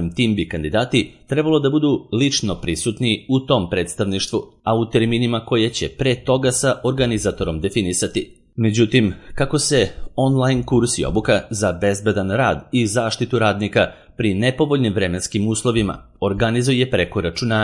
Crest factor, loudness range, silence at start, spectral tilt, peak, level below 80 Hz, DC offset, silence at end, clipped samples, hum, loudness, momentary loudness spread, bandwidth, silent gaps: 18 dB; 1 LU; 0 s; -5 dB/octave; 0 dBFS; -40 dBFS; under 0.1%; 0 s; under 0.1%; none; -19 LUFS; 5 LU; 11.5 kHz; none